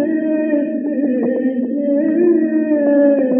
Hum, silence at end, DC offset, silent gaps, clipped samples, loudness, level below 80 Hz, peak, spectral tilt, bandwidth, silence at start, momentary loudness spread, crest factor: none; 0 s; under 0.1%; none; under 0.1%; -16 LUFS; -74 dBFS; -4 dBFS; -12.5 dB/octave; 3.3 kHz; 0 s; 6 LU; 12 dB